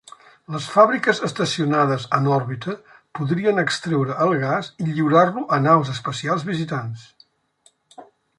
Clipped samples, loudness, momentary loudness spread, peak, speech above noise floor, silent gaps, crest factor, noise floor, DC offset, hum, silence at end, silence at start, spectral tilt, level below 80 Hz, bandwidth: under 0.1%; -20 LUFS; 13 LU; -2 dBFS; 40 dB; none; 20 dB; -60 dBFS; under 0.1%; none; 0.35 s; 0.5 s; -6 dB/octave; -64 dBFS; 11.5 kHz